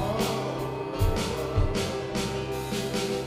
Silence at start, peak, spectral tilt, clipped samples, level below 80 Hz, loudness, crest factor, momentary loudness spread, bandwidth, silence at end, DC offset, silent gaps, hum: 0 s; -12 dBFS; -5 dB/octave; under 0.1%; -36 dBFS; -29 LUFS; 16 dB; 4 LU; 16 kHz; 0 s; under 0.1%; none; none